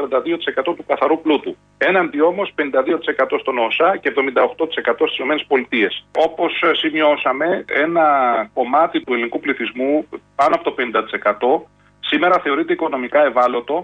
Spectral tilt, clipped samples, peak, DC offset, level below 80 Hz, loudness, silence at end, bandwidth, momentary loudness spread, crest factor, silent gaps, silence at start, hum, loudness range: -5.5 dB/octave; under 0.1%; -4 dBFS; under 0.1%; -62 dBFS; -17 LUFS; 0 s; 8.6 kHz; 5 LU; 14 dB; none; 0 s; 50 Hz at -55 dBFS; 2 LU